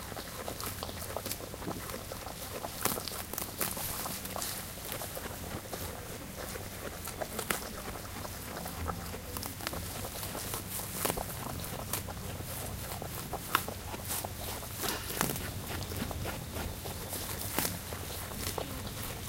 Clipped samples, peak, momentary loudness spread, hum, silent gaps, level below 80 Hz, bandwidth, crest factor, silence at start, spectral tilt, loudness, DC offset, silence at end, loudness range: under 0.1%; -4 dBFS; 7 LU; none; none; -50 dBFS; 17 kHz; 34 dB; 0 s; -3 dB/octave; -37 LUFS; under 0.1%; 0 s; 3 LU